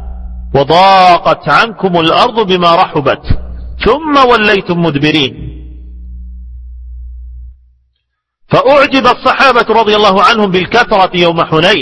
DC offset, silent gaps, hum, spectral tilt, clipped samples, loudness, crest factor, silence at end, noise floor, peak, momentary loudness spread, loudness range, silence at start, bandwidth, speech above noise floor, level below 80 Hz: under 0.1%; none; none; -5.5 dB/octave; 1%; -8 LUFS; 10 dB; 0 s; -67 dBFS; 0 dBFS; 20 LU; 9 LU; 0 s; 11 kHz; 59 dB; -28 dBFS